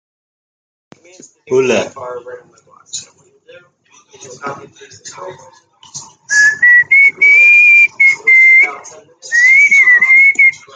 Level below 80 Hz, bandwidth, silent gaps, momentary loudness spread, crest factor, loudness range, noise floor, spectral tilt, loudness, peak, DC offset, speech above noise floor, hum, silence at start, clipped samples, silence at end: -70 dBFS; 9.4 kHz; none; 23 LU; 12 dB; 15 LU; -49 dBFS; -1.5 dB/octave; -6 LUFS; 0 dBFS; under 0.1%; 36 dB; none; 1.5 s; under 0.1%; 0.2 s